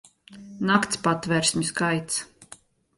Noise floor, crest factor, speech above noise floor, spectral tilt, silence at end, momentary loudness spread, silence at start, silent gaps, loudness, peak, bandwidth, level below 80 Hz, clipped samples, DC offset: -51 dBFS; 20 dB; 27 dB; -3.5 dB/octave; 0.45 s; 8 LU; 0.3 s; none; -24 LUFS; -6 dBFS; 11.5 kHz; -60 dBFS; under 0.1%; under 0.1%